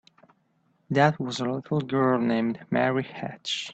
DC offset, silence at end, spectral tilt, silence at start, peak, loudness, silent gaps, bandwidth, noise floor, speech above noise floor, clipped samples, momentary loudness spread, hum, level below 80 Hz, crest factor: under 0.1%; 0 s; -6 dB/octave; 0.9 s; -8 dBFS; -26 LUFS; none; 8.6 kHz; -68 dBFS; 43 dB; under 0.1%; 8 LU; none; -68 dBFS; 18 dB